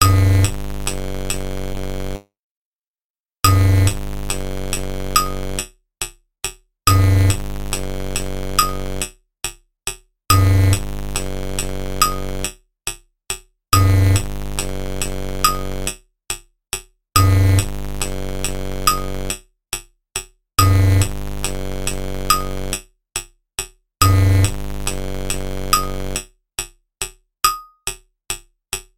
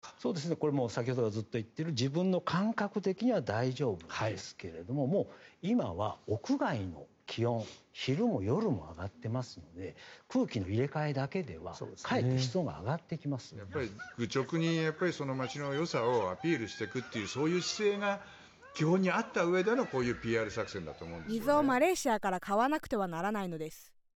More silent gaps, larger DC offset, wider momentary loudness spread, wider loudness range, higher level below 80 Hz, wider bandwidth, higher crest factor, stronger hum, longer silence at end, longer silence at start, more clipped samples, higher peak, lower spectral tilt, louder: first, 2.39-2.94 s, 3.01-3.24 s vs none; neither; about the same, 14 LU vs 12 LU; about the same, 3 LU vs 4 LU; first, -26 dBFS vs -64 dBFS; about the same, 17 kHz vs 17.5 kHz; about the same, 20 dB vs 18 dB; neither; second, 0.15 s vs 0.35 s; about the same, 0 s vs 0.05 s; neither; first, 0 dBFS vs -16 dBFS; second, -4 dB/octave vs -6 dB/octave; first, -20 LUFS vs -34 LUFS